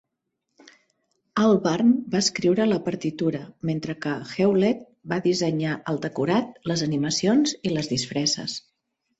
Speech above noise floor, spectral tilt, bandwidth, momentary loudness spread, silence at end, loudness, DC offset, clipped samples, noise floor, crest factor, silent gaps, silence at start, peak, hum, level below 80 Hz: 57 dB; -5 dB/octave; 8.2 kHz; 9 LU; 0.6 s; -24 LUFS; under 0.1%; under 0.1%; -80 dBFS; 16 dB; none; 1.35 s; -8 dBFS; none; -62 dBFS